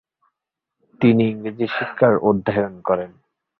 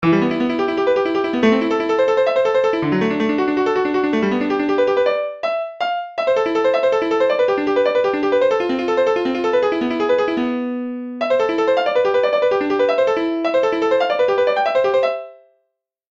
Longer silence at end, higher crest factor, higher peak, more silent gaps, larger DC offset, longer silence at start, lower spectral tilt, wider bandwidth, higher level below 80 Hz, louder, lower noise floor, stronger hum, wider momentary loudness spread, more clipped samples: second, 0.5 s vs 0.8 s; about the same, 18 dB vs 14 dB; about the same, -2 dBFS vs -2 dBFS; neither; neither; first, 1 s vs 0 s; first, -10 dB/octave vs -6 dB/octave; second, 4.6 kHz vs 7.6 kHz; about the same, -56 dBFS vs -58 dBFS; about the same, -19 LUFS vs -18 LUFS; first, -83 dBFS vs -73 dBFS; neither; first, 8 LU vs 5 LU; neither